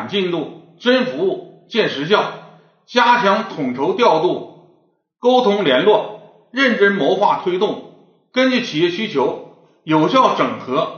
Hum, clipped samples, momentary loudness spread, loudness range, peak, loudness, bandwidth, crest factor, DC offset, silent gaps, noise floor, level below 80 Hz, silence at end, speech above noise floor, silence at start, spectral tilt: none; under 0.1%; 12 LU; 2 LU; 0 dBFS; -17 LUFS; 6.8 kHz; 18 dB; under 0.1%; none; -59 dBFS; -70 dBFS; 0 s; 43 dB; 0 s; -2.5 dB/octave